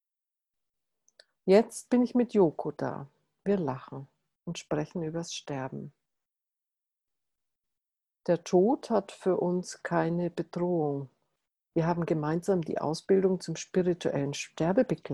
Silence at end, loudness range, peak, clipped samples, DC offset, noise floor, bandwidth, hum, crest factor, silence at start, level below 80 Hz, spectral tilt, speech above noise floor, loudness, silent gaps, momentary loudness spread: 0 s; 10 LU; -10 dBFS; under 0.1%; under 0.1%; -89 dBFS; 12 kHz; none; 20 dB; 1.45 s; -68 dBFS; -6.5 dB/octave; 61 dB; -29 LUFS; none; 14 LU